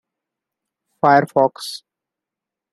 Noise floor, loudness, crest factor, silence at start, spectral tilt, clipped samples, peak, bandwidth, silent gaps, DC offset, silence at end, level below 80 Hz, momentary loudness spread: -86 dBFS; -16 LUFS; 20 dB; 1.05 s; -5.5 dB/octave; under 0.1%; -2 dBFS; 13 kHz; none; under 0.1%; 0.95 s; -68 dBFS; 16 LU